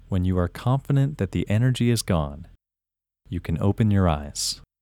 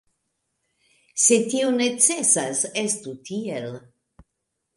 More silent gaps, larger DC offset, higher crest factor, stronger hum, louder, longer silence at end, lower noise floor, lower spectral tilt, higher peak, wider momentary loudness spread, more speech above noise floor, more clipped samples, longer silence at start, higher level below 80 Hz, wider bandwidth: neither; neither; about the same, 18 dB vs 22 dB; neither; second, -24 LUFS vs -20 LUFS; second, 0.25 s vs 1 s; first, -89 dBFS vs -79 dBFS; first, -6 dB/octave vs -2 dB/octave; about the same, -6 dBFS vs -4 dBFS; second, 9 LU vs 15 LU; first, 66 dB vs 57 dB; neither; second, 0.1 s vs 1.15 s; first, -40 dBFS vs -68 dBFS; first, 17 kHz vs 11.5 kHz